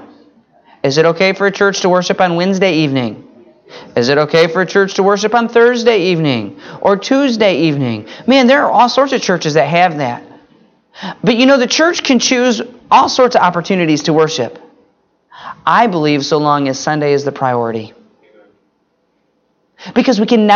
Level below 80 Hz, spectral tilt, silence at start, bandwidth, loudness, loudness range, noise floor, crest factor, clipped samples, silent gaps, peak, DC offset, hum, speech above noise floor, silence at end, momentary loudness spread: -58 dBFS; -4.5 dB/octave; 0 s; 7.4 kHz; -12 LUFS; 4 LU; -61 dBFS; 14 dB; under 0.1%; none; 0 dBFS; under 0.1%; none; 49 dB; 0 s; 10 LU